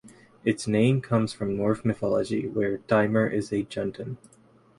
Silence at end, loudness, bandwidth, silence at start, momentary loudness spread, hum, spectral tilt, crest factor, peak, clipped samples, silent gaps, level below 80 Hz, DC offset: 0.6 s; -26 LUFS; 11.5 kHz; 0.05 s; 9 LU; none; -7 dB/octave; 18 dB; -8 dBFS; under 0.1%; none; -58 dBFS; under 0.1%